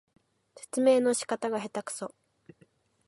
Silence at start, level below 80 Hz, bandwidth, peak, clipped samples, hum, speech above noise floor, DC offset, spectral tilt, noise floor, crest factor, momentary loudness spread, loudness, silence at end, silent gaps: 0.6 s; -82 dBFS; 11.5 kHz; -12 dBFS; under 0.1%; none; 37 dB; under 0.1%; -3.5 dB/octave; -65 dBFS; 20 dB; 16 LU; -29 LUFS; 1 s; none